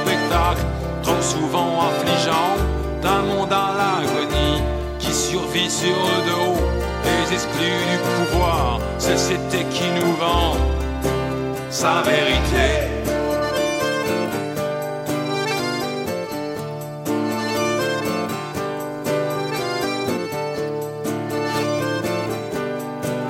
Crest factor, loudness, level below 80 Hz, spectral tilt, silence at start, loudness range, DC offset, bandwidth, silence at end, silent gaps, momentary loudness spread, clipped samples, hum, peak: 18 dB; -21 LUFS; -30 dBFS; -4.5 dB/octave; 0 s; 4 LU; under 0.1%; 16.5 kHz; 0 s; none; 7 LU; under 0.1%; none; -4 dBFS